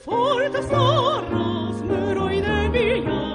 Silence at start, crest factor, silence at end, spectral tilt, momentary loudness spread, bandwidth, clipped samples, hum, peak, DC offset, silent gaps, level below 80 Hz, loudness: 0.05 s; 14 dB; 0 s; -6.5 dB/octave; 6 LU; 10 kHz; under 0.1%; none; -6 dBFS; under 0.1%; none; -36 dBFS; -21 LUFS